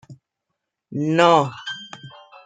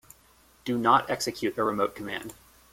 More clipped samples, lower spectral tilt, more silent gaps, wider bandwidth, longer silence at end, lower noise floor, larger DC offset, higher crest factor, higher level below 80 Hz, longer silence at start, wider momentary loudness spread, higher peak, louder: neither; first, -5.5 dB/octave vs -4 dB/octave; neither; second, 9.4 kHz vs 16.5 kHz; about the same, 0.4 s vs 0.4 s; first, -80 dBFS vs -60 dBFS; neither; about the same, 22 dB vs 22 dB; second, -70 dBFS vs -62 dBFS; second, 0.1 s vs 0.65 s; first, 22 LU vs 15 LU; first, -2 dBFS vs -8 dBFS; first, -18 LUFS vs -27 LUFS